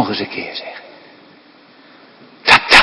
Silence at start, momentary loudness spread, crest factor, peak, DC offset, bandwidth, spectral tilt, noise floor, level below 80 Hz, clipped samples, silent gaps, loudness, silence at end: 0 s; 23 LU; 16 dB; 0 dBFS; under 0.1%; 11 kHz; -2 dB/octave; -46 dBFS; -52 dBFS; 0.6%; none; -13 LUFS; 0 s